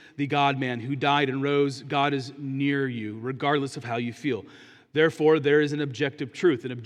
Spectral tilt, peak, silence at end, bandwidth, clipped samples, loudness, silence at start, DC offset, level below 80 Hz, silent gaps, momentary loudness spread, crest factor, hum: -6 dB/octave; -8 dBFS; 0 s; 10.5 kHz; under 0.1%; -25 LUFS; 0.2 s; under 0.1%; -76 dBFS; none; 9 LU; 18 dB; none